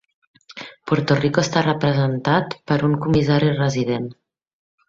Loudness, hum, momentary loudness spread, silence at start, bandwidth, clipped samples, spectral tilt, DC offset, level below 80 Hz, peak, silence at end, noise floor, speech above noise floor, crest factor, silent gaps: -19 LUFS; none; 16 LU; 0.5 s; 7.6 kHz; under 0.1%; -6.5 dB/octave; under 0.1%; -52 dBFS; -2 dBFS; 0.75 s; -39 dBFS; 21 dB; 18 dB; none